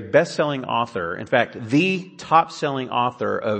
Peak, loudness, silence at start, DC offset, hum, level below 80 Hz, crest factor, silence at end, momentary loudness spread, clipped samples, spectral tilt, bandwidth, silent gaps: -2 dBFS; -22 LUFS; 0 s; under 0.1%; none; -64 dBFS; 20 dB; 0 s; 7 LU; under 0.1%; -5.5 dB/octave; 8.8 kHz; none